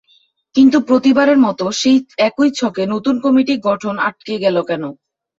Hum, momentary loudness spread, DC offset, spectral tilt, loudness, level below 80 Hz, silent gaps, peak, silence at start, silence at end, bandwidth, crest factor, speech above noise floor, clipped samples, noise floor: none; 8 LU; under 0.1%; -5 dB/octave; -15 LUFS; -58 dBFS; none; -2 dBFS; 0.55 s; 0.45 s; 7.8 kHz; 12 dB; 42 dB; under 0.1%; -56 dBFS